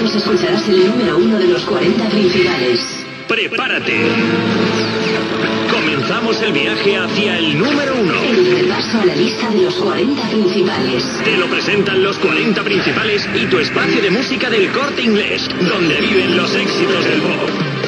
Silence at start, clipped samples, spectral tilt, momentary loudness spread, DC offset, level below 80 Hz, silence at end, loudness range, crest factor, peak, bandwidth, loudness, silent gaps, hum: 0 s; under 0.1%; -5 dB/octave; 3 LU; under 0.1%; -50 dBFS; 0 s; 1 LU; 14 dB; 0 dBFS; 11 kHz; -14 LUFS; none; none